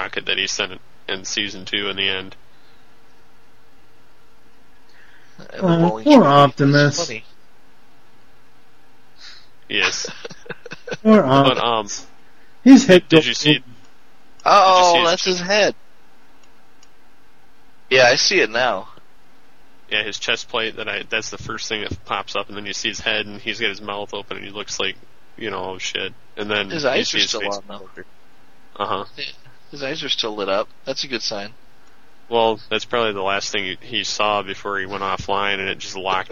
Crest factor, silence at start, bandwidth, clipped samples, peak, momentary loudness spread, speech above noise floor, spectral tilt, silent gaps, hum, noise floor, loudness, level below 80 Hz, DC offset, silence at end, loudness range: 20 dB; 0 s; 9.8 kHz; under 0.1%; 0 dBFS; 17 LU; 36 dB; -4 dB/octave; none; none; -55 dBFS; -18 LUFS; -54 dBFS; 2%; 0.05 s; 11 LU